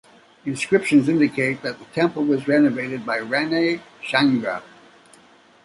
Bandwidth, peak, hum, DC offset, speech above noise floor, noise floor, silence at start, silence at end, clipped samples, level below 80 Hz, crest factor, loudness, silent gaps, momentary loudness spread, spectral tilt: 11.5 kHz; -4 dBFS; none; under 0.1%; 32 dB; -52 dBFS; 0.45 s; 1 s; under 0.1%; -64 dBFS; 18 dB; -21 LUFS; none; 12 LU; -5.5 dB/octave